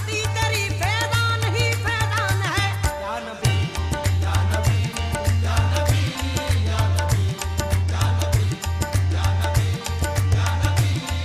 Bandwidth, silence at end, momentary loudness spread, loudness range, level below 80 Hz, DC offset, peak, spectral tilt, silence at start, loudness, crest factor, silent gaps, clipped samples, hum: 15.5 kHz; 0 s; 4 LU; 1 LU; -32 dBFS; under 0.1%; -4 dBFS; -4.5 dB/octave; 0 s; -22 LUFS; 16 dB; none; under 0.1%; none